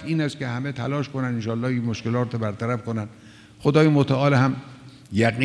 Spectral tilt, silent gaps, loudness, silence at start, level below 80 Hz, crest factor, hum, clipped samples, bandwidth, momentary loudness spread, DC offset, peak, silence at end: -7.5 dB/octave; none; -23 LUFS; 0 s; -58 dBFS; 18 dB; none; under 0.1%; 11 kHz; 11 LU; under 0.1%; -4 dBFS; 0 s